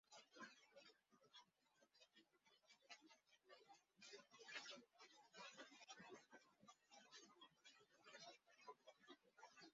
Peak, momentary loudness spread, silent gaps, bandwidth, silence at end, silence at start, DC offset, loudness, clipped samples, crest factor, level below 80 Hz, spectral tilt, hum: -42 dBFS; 11 LU; none; 7.4 kHz; 0 s; 0.05 s; under 0.1%; -64 LUFS; under 0.1%; 26 dB; under -90 dBFS; 0 dB/octave; none